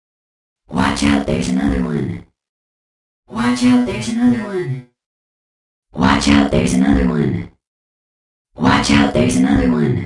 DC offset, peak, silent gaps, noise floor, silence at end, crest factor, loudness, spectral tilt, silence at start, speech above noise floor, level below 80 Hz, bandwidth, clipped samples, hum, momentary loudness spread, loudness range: under 0.1%; -2 dBFS; 2.49-3.23 s, 5.06-5.83 s, 7.67-8.45 s; under -90 dBFS; 0 s; 16 dB; -16 LUFS; -5.5 dB/octave; 0.7 s; over 75 dB; -32 dBFS; 11.5 kHz; under 0.1%; none; 13 LU; 3 LU